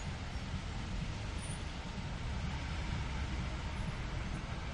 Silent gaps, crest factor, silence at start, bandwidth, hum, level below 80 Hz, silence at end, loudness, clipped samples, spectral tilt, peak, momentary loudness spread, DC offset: none; 14 dB; 0 s; 11 kHz; none; -42 dBFS; 0 s; -41 LUFS; under 0.1%; -5 dB/octave; -26 dBFS; 3 LU; under 0.1%